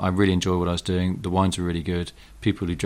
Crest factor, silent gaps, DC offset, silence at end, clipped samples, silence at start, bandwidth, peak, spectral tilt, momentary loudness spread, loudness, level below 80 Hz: 16 dB; none; under 0.1%; 0 s; under 0.1%; 0 s; 14 kHz; -6 dBFS; -6 dB/octave; 7 LU; -24 LUFS; -42 dBFS